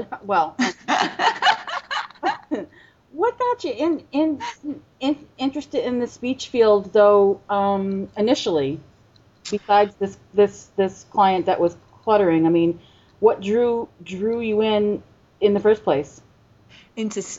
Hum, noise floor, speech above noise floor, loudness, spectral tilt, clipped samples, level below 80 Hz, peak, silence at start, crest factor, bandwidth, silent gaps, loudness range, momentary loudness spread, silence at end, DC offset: none; -54 dBFS; 34 dB; -21 LUFS; -5 dB/octave; under 0.1%; -58 dBFS; -2 dBFS; 0 s; 18 dB; 8 kHz; none; 5 LU; 12 LU; 0 s; under 0.1%